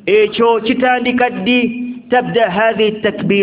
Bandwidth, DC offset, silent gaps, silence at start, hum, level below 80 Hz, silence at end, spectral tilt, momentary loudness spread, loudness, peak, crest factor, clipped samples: 4 kHz; under 0.1%; none; 0.05 s; none; -50 dBFS; 0 s; -9.5 dB/octave; 4 LU; -14 LUFS; 0 dBFS; 14 dB; under 0.1%